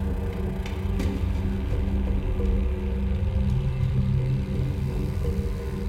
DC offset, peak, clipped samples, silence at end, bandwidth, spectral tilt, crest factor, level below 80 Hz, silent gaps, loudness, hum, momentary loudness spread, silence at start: under 0.1%; -14 dBFS; under 0.1%; 0 s; 13.5 kHz; -8.5 dB/octave; 12 dB; -28 dBFS; none; -27 LUFS; none; 4 LU; 0 s